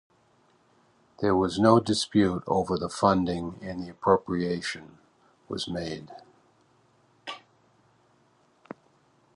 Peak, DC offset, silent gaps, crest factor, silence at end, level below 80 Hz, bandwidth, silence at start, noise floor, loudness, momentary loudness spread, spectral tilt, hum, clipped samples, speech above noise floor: -4 dBFS; under 0.1%; none; 24 dB; 2 s; -56 dBFS; 11.5 kHz; 1.2 s; -64 dBFS; -26 LUFS; 22 LU; -5.5 dB/octave; none; under 0.1%; 39 dB